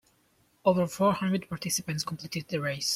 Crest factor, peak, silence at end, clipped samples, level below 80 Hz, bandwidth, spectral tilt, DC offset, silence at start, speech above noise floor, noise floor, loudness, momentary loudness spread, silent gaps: 20 dB; -10 dBFS; 0 s; under 0.1%; -64 dBFS; 16 kHz; -4.5 dB/octave; under 0.1%; 0.65 s; 39 dB; -67 dBFS; -29 LUFS; 8 LU; none